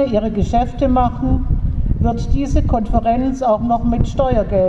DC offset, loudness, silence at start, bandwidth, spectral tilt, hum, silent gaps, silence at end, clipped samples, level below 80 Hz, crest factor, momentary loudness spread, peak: under 0.1%; -18 LUFS; 0 s; 8 kHz; -8.5 dB/octave; none; none; 0 s; under 0.1%; -20 dBFS; 14 dB; 3 LU; -2 dBFS